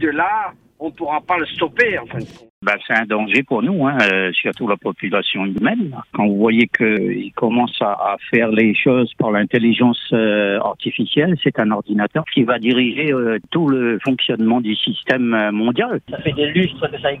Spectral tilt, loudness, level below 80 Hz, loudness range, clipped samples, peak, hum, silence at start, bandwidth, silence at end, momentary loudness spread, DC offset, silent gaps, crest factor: -7 dB/octave; -17 LUFS; -56 dBFS; 2 LU; under 0.1%; 0 dBFS; none; 0 s; 7.6 kHz; 0 s; 8 LU; under 0.1%; 2.50-2.61 s; 18 dB